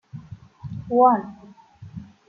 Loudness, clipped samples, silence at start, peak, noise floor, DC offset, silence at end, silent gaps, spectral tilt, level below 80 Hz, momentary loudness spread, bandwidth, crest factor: -19 LUFS; under 0.1%; 0.15 s; -4 dBFS; -45 dBFS; under 0.1%; 0.25 s; none; -10 dB/octave; -58 dBFS; 24 LU; 4.9 kHz; 20 dB